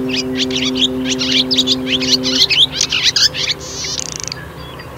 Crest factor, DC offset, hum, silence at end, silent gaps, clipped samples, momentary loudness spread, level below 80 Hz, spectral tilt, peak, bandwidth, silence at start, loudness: 16 dB; under 0.1%; none; 0 s; none; under 0.1%; 13 LU; -42 dBFS; -2 dB/octave; 0 dBFS; 16 kHz; 0 s; -13 LUFS